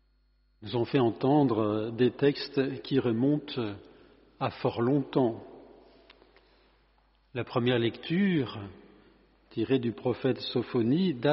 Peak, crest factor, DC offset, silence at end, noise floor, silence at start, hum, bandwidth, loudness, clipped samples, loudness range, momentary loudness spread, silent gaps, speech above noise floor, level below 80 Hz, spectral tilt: -12 dBFS; 18 dB; under 0.1%; 0 s; -68 dBFS; 0.6 s; none; 5.8 kHz; -29 LUFS; under 0.1%; 6 LU; 12 LU; none; 40 dB; -66 dBFS; -6 dB/octave